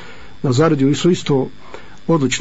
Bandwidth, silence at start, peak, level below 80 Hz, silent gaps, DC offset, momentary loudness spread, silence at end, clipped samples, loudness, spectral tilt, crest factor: 8 kHz; 0 s; -4 dBFS; -48 dBFS; none; 3%; 11 LU; 0 s; under 0.1%; -17 LUFS; -6 dB/octave; 14 dB